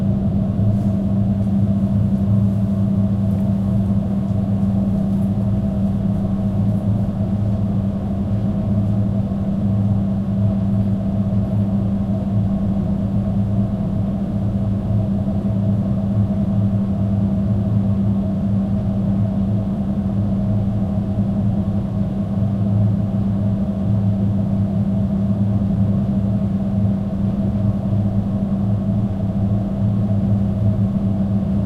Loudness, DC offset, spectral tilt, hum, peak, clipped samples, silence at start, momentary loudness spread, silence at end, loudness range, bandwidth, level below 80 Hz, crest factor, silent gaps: -19 LUFS; under 0.1%; -11 dB/octave; none; -6 dBFS; under 0.1%; 0 s; 3 LU; 0 s; 2 LU; 4.4 kHz; -34 dBFS; 12 dB; none